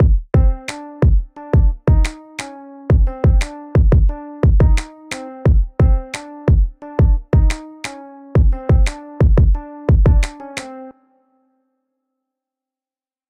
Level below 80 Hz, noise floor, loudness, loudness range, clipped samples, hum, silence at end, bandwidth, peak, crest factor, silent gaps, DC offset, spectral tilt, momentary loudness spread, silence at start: -18 dBFS; under -90 dBFS; -17 LUFS; 2 LU; under 0.1%; none; 2.4 s; 10 kHz; -2 dBFS; 12 dB; none; under 0.1%; -7.5 dB/octave; 15 LU; 0 s